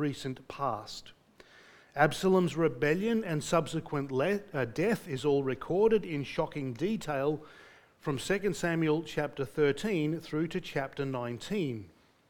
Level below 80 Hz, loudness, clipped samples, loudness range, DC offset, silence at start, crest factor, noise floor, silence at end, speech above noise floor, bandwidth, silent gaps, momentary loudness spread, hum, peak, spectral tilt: -58 dBFS; -31 LUFS; under 0.1%; 3 LU; under 0.1%; 0 s; 22 dB; -58 dBFS; 0.4 s; 27 dB; 18.5 kHz; none; 10 LU; none; -10 dBFS; -6 dB/octave